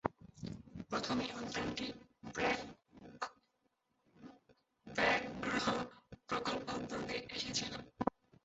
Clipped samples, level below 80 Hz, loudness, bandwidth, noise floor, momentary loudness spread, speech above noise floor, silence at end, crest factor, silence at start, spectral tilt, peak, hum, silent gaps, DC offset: under 0.1%; -66 dBFS; -39 LUFS; 8 kHz; -81 dBFS; 17 LU; 42 dB; 0.35 s; 28 dB; 0.05 s; -2.5 dB/octave; -14 dBFS; none; none; under 0.1%